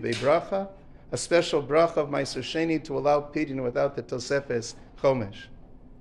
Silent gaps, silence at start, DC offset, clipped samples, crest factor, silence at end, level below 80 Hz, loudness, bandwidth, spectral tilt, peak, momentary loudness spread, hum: none; 0 s; under 0.1%; under 0.1%; 18 dB; 0 s; -54 dBFS; -26 LUFS; 12 kHz; -5 dB/octave; -10 dBFS; 10 LU; none